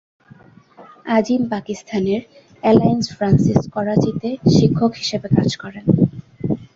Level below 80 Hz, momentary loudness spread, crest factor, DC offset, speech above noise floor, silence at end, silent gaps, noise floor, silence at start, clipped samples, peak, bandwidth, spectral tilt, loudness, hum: -46 dBFS; 10 LU; 16 dB; under 0.1%; 30 dB; 0.1 s; none; -46 dBFS; 0.8 s; under 0.1%; -2 dBFS; 7.8 kHz; -7 dB/octave; -18 LUFS; none